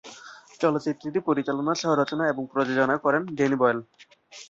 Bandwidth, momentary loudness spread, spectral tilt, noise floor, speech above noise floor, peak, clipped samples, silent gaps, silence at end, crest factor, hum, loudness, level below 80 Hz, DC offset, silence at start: 7.8 kHz; 6 LU; -5.5 dB/octave; -47 dBFS; 22 dB; -8 dBFS; under 0.1%; none; 0.05 s; 18 dB; none; -25 LUFS; -70 dBFS; under 0.1%; 0.05 s